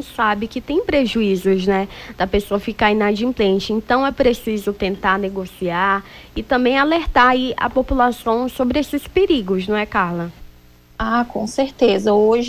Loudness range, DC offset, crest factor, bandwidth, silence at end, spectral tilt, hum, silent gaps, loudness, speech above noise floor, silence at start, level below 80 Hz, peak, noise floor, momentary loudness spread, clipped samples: 3 LU; under 0.1%; 16 dB; 16 kHz; 0 s; -5.5 dB/octave; none; none; -18 LUFS; 28 dB; 0 s; -38 dBFS; -2 dBFS; -46 dBFS; 8 LU; under 0.1%